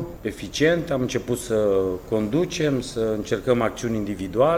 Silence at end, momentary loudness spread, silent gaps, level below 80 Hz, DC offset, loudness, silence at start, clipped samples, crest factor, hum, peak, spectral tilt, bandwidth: 0 s; 6 LU; none; -44 dBFS; under 0.1%; -24 LUFS; 0 s; under 0.1%; 16 dB; none; -6 dBFS; -5.5 dB/octave; 16.5 kHz